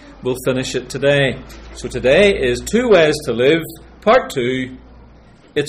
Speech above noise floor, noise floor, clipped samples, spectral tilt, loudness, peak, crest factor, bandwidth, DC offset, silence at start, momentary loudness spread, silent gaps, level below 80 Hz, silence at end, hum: 29 dB; -45 dBFS; under 0.1%; -5 dB/octave; -16 LUFS; -2 dBFS; 14 dB; 16 kHz; under 0.1%; 0.05 s; 16 LU; none; -38 dBFS; 0 s; none